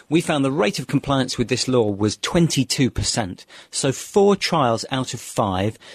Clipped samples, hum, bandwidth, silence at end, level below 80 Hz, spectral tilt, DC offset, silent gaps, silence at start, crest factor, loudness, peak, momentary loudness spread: under 0.1%; none; 13.5 kHz; 0 s; -44 dBFS; -4.5 dB/octave; under 0.1%; none; 0.1 s; 16 dB; -20 LUFS; -4 dBFS; 7 LU